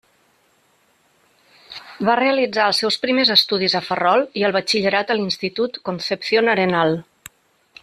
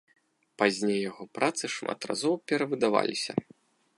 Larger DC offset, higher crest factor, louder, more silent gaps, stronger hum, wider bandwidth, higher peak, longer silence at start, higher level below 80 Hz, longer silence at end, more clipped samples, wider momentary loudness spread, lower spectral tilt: neither; about the same, 18 dB vs 22 dB; first, -18 LUFS vs -29 LUFS; neither; neither; first, 14 kHz vs 11.5 kHz; first, -2 dBFS vs -8 dBFS; first, 1.7 s vs 0.6 s; first, -64 dBFS vs -74 dBFS; first, 0.8 s vs 0.55 s; neither; first, 10 LU vs 7 LU; about the same, -4 dB/octave vs -4 dB/octave